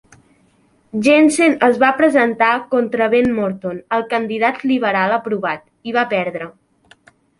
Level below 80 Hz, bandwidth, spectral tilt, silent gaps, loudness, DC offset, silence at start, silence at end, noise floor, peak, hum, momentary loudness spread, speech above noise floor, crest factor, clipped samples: -58 dBFS; 11.5 kHz; -4.5 dB/octave; none; -16 LUFS; under 0.1%; 0.95 s; 0.9 s; -56 dBFS; -2 dBFS; none; 11 LU; 41 dB; 16 dB; under 0.1%